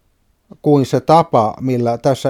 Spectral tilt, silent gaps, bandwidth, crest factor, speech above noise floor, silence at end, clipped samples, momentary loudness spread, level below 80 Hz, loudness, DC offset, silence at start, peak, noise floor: -7.5 dB/octave; none; 15.5 kHz; 16 dB; 46 dB; 0 s; under 0.1%; 6 LU; -54 dBFS; -15 LUFS; under 0.1%; 0.65 s; 0 dBFS; -60 dBFS